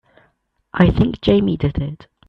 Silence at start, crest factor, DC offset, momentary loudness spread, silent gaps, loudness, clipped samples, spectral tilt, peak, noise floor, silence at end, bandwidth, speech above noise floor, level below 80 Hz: 0.75 s; 18 dB; under 0.1%; 13 LU; none; -17 LUFS; under 0.1%; -9 dB/octave; 0 dBFS; -63 dBFS; 0.35 s; 5.8 kHz; 47 dB; -32 dBFS